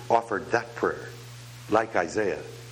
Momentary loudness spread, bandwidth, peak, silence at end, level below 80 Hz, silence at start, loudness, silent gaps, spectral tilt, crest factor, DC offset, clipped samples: 17 LU; 18 kHz; -6 dBFS; 0 s; -60 dBFS; 0 s; -28 LUFS; none; -5 dB/octave; 22 dB; under 0.1%; under 0.1%